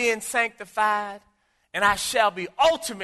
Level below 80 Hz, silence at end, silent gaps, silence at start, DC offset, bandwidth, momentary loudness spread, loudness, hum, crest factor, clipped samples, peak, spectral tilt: -56 dBFS; 0 s; none; 0 s; under 0.1%; 12.5 kHz; 6 LU; -23 LUFS; none; 20 dB; under 0.1%; -6 dBFS; -1.5 dB/octave